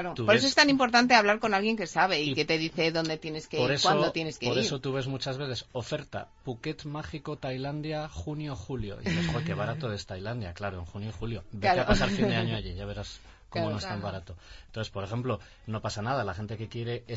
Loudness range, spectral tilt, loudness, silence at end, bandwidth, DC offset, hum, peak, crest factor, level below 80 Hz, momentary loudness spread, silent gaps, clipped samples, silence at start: 10 LU; -4.5 dB/octave; -29 LUFS; 0 s; 8 kHz; under 0.1%; none; -6 dBFS; 22 dB; -48 dBFS; 16 LU; none; under 0.1%; 0 s